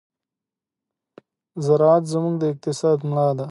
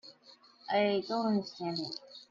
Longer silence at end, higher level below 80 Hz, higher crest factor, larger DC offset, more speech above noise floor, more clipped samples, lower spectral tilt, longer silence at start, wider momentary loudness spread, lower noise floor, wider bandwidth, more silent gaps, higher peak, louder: about the same, 0 s vs 0.05 s; first, -72 dBFS vs -78 dBFS; about the same, 16 dB vs 16 dB; neither; first, 69 dB vs 28 dB; neither; first, -7.5 dB/octave vs -6 dB/octave; first, 1.55 s vs 0.05 s; second, 9 LU vs 17 LU; first, -88 dBFS vs -60 dBFS; first, 11.5 kHz vs 7.4 kHz; neither; first, -4 dBFS vs -18 dBFS; first, -20 LUFS vs -33 LUFS